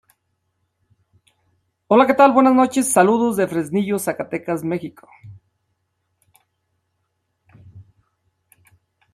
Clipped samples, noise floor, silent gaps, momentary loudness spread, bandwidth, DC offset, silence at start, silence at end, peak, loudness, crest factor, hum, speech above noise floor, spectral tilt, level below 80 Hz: under 0.1%; -72 dBFS; none; 13 LU; 15.5 kHz; under 0.1%; 1.9 s; 1.3 s; -2 dBFS; -17 LUFS; 20 dB; none; 56 dB; -5 dB/octave; -66 dBFS